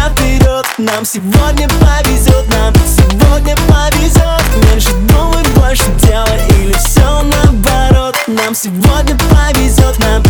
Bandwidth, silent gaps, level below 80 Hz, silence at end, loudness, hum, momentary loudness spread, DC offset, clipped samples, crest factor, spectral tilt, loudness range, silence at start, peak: over 20 kHz; none; -12 dBFS; 0 s; -10 LUFS; none; 3 LU; 0.4%; under 0.1%; 8 dB; -5 dB/octave; 1 LU; 0 s; 0 dBFS